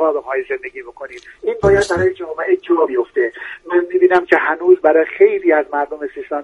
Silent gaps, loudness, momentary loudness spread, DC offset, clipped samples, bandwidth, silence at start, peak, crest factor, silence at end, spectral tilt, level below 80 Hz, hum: none; -16 LUFS; 15 LU; under 0.1%; under 0.1%; 11 kHz; 0 s; 0 dBFS; 16 dB; 0 s; -6 dB/octave; -44 dBFS; none